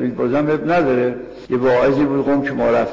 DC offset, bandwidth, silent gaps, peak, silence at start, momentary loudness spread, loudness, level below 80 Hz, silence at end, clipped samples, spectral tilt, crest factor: under 0.1%; 7.6 kHz; none; -8 dBFS; 0 s; 6 LU; -17 LUFS; -48 dBFS; 0 s; under 0.1%; -8 dB/octave; 10 dB